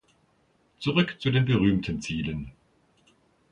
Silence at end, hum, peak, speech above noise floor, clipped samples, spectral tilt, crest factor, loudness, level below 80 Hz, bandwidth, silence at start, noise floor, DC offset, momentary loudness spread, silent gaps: 1 s; none; -10 dBFS; 41 dB; under 0.1%; -6.5 dB/octave; 18 dB; -26 LUFS; -50 dBFS; 10 kHz; 0.8 s; -66 dBFS; under 0.1%; 11 LU; none